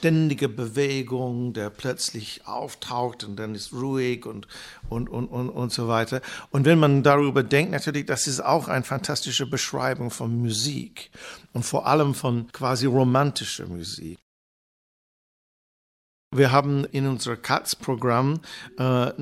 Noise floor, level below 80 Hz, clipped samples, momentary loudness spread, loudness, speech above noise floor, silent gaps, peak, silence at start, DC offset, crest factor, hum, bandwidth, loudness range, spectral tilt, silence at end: under -90 dBFS; -54 dBFS; under 0.1%; 14 LU; -24 LUFS; over 66 dB; 14.22-16.31 s; -4 dBFS; 0 s; under 0.1%; 22 dB; none; 15.5 kHz; 8 LU; -5 dB/octave; 0 s